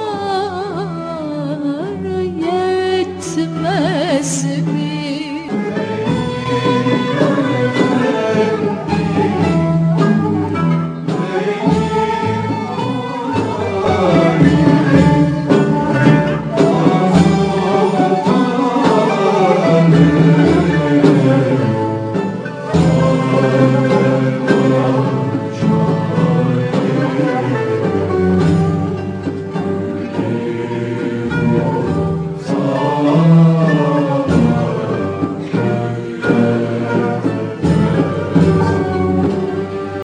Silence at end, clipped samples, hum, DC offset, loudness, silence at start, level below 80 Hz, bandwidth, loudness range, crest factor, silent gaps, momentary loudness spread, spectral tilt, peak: 0 s; under 0.1%; none; under 0.1%; -15 LUFS; 0 s; -42 dBFS; 10 kHz; 6 LU; 14 dB; none; 9 LU; -7 dB/octave; 0 dBFS